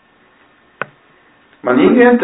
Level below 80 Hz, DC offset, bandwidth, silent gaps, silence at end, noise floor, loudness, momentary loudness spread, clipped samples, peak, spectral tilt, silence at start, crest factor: -54 dBFS; under 0.1%; 4 kHz; none; 0 s; -51 dBFS; -11 LUFS; 20 LU; under 0.1%; 0 dBFS; -10.5 dB/octave; 0.8 s; 14 dB